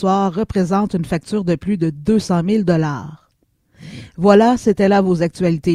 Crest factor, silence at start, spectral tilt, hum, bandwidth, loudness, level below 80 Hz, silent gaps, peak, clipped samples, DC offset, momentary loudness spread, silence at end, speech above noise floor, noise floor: 16 dB; 0 s; -7.5 dB/octave; none; 11.5 kHz; -16 LUFS; -44 dBFS; none; 0 dBFS; under 0.1%; under 0.1%; 12 LU; 0 s; 46 dB; -62 dBFS